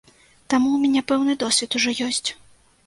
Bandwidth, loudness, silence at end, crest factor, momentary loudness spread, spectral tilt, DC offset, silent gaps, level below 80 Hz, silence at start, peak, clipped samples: 11.5 kHz; -21 LUFS; 0.5 s; 16 dB; 5 LU; -1.5 dB/octave; under 0.1%; none; -60 dBFS; 0.5 s; -6 dBFS; under 0.1%